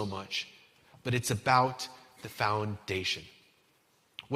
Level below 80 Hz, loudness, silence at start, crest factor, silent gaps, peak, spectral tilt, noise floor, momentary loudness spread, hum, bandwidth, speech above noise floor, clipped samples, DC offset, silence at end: -66 dBFS; -31 LUFS; 0 s; 24 dB; none; -10 dBFS; -4 dB/octave; -69 dBFS; 20 LU; none; 16 kHz; 38 dB; under 0.1%; under 0.1%; 0 s